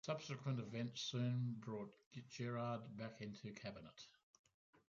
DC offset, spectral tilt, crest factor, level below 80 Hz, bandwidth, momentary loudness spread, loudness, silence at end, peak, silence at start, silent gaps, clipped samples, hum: under 0.1%; -5.5 dB/octave; 16 dB; -82 dBFS; 7.4 kHz; 15 LU; -47 LUFS; 0.15 s; -32 dBFS; 0.05 s; 2.06-2.11 s, 4.23-4.44 s, 4.54-4.73 s; under 0.1%; none